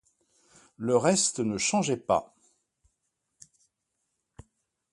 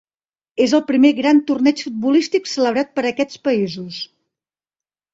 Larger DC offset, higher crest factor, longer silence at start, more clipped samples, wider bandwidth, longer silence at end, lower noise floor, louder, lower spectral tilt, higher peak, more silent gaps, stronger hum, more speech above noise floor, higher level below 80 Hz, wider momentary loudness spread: neither; first, 22 dB vs 16 dB; first, 0.8 s vs 0.55 s; neither; first, 11.5 kHz vs 7.8 kHz; first, 2.7 s vs 1.1 s; second, -81 dBFS vs under -90 dBFS; second, -26 LUFS vs -17 LUFS; about the same, -3.5 dB/octave vs -4.5 dB/octave; second, -10 dBFS vs -2 dBFS; neither; neither; second, 55 dB vs over 73 dB; about the same, -64 dBFS vs -64 dBFS; second, 5 LU vs 14 LU